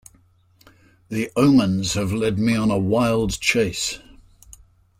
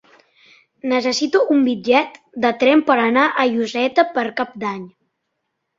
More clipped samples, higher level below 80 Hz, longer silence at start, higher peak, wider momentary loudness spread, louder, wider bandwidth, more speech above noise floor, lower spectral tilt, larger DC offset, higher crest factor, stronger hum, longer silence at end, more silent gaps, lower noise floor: neither; first, -44 dBFS vs -66 dBFS; first, 1.1 s vs 0.85 s; about the same, -4 dBFS vs -2 dBFS; about the same, 10 LU vs 11 LU; second, -20 LUFS vs -17 LUFS; first, 16 kHz vs 7.8 kHz; second, 37 dB vs 58 dB; about the same, -5 dB/octave vs -4 dB/octave; neither; about the same, 18 dB vs 18 dB; neither; about the same, 1 s vs 0.9 s; neither; second, -57 dBFS vs -75 dBFS